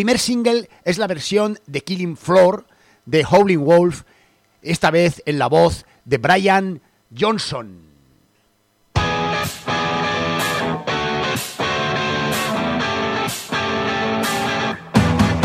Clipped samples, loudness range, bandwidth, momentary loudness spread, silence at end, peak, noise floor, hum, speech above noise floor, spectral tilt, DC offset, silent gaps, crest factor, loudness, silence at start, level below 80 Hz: under 0.1%; 5 LU; 16 kHz; 10 LU; 0 s; 0 dBFS; -61 dBFS; none; 44 dB; -5 dB/octave; under 0.1%; none; 18 dB; -18 LUFS; 0 s; -42 dBFS